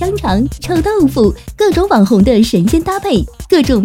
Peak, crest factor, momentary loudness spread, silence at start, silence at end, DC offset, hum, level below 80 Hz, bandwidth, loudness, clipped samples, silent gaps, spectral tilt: 0 dBFS; 12 dB; 6 LU; 0 s; 0 s; under 0.1%; none; -26 dBFS; 16.5 kHz; -12 LUFS; under 0.1%; none; -6.5 dB/octave